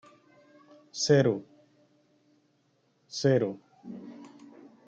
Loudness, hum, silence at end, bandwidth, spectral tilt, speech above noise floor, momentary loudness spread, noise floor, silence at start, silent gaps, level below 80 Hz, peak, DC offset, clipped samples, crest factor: -27 LUFS; none; 0.6 s; 8.6 kHz; -5.5 dB/octave; 45 dB; 24 LU; -70 dBFS; 0.95 s; none; -76 dBFS; -10 dBFS; under 0.1%; under 0.1%; 22 dB